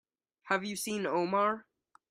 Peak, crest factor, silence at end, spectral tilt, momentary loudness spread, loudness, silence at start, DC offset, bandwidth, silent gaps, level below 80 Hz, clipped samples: -14 dBFS; 20 dB; 0.5 s; -4 dB/octave; 6 LU; -32 LUFS; 0.45 s; under 0.1%; 15.5 kHz; none; -78 dBFS; under 0.1%